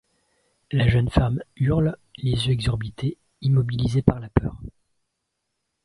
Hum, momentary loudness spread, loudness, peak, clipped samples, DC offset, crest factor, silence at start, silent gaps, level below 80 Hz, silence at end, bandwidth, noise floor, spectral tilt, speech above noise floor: none; 9 LU; -23 LUFS; 0 dBFS; under 0.1%; under 0.1%; 24 dB; 0.7 s; none; -36 dBFS; 1.15 s; 11.5 kHz; -78 dBFS; -7.5 dB/octave; 57 dB